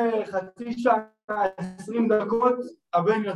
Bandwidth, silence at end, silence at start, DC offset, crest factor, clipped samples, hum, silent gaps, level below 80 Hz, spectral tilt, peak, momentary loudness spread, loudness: 11.5 kHz; 0 s; 0 s; under 0.1%; 16 dB; under 0.1%; none; 1.24-1.28 s; -66 dBFS; -7 dB/octave; -8 dBFS; 9 LU; -25 LUFS